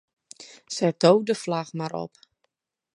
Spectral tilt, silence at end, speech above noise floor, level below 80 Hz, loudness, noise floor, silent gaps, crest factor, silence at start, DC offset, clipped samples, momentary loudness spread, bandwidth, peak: -5.5 dB/octave; 0.9 s; 53 dB; -74 dBFS; -24 LUFS; -76 dBFS; none; 22 dB; 0.4 s; under 0.1%; under 0.1%; 25 LU; 11.5 kHz; -4 dBFS